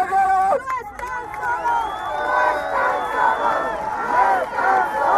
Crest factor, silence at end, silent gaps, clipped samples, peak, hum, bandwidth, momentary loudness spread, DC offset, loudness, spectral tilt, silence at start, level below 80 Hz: 16 dB; 0 s; none; under 0.1%; -4 dBFS; none; 13.5 kHz; 9 LU; under 0.1%; -20 LUFS; -3.5 dB/octave; 0 s; -50 dBFS